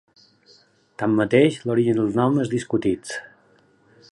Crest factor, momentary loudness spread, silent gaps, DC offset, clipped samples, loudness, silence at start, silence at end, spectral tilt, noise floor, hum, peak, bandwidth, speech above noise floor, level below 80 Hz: 20 dB; 11 LU; none; under 0.1%; under 0.1%; -21 LUFS; 1 s; 0.9 s; -6.5 dB/octave; -58 dBFS; none; -4 dBFS; 11.5 kHz; 38 dB; -58 dBFS